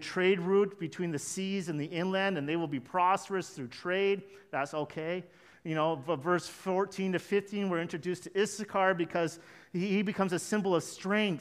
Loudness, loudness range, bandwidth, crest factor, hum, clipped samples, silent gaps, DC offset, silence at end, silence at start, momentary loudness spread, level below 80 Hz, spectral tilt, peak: -32 LUFS; 2 LU; 15 kHz; 18 dB; none; under 0.1%; none; under 0.1%; 0 s; 0 s; 8 LU; -76 dBFS; -5 dB/octave; -12 dBFS